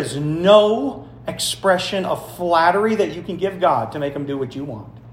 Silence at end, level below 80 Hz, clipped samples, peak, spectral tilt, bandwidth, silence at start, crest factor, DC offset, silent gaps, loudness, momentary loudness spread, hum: 0 s; -52 dBFS; under 0.1%; 0 dBFS; -4.5 dB/octave; 16 kHz; 0 s; 18 dB; under 0.1%; none; -19 LUFS; 15 LU; none